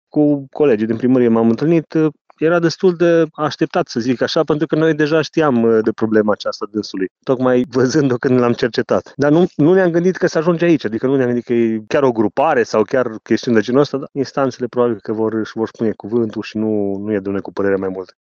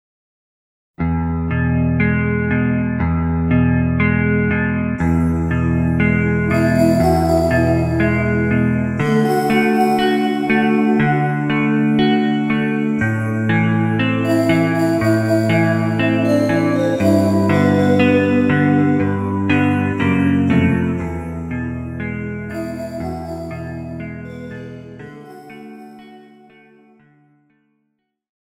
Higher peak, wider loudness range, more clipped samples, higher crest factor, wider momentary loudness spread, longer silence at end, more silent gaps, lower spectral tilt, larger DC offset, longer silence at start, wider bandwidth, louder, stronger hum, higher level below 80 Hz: about the same, 0 dBFS vs -2 dBFS; second, 4 LU vs 12 LU; neither; about the same, 16 dB vs 16 dB; second, 7 LU vs 13 LU; second, 0.2 s vs 2.25 s; first, 2.21-2.25 s, 7.11-7.16 s vs none; about the same, -7 dB/octave vs -7.5 dB/octave; neither; second, 0.15 s vs 1 s; second, 7.2 kHz vs 15.5 kHz; about the same, -16 LUFS vs -17 LUFS; neither; second, -58 dBFS vs -34 dBFS